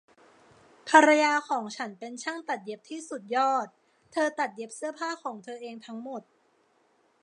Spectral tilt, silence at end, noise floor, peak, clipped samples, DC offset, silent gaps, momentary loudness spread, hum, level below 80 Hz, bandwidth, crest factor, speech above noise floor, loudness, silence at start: -2.5 dB/octave; 1 s; -67 dBFS; -4 dBFS; under 0.1%; under 0.1%; none; 20 LU; none; -86 dBFS; 11 kHz; 26 dB; 40 dB; -27 LUFS; 0.85 s